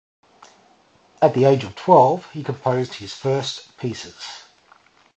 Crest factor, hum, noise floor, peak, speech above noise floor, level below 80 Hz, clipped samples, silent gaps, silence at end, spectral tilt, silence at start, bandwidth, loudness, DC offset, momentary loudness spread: 22 dB; none; -56 dBFS; 0 dBFS; 36 dB; -60 dBFS; under 0.1%; none; 0.8 s; -6 dB/octave; 1.2 s; 8.4 kHz; -20 LUFS; under 0.1%; 19 LU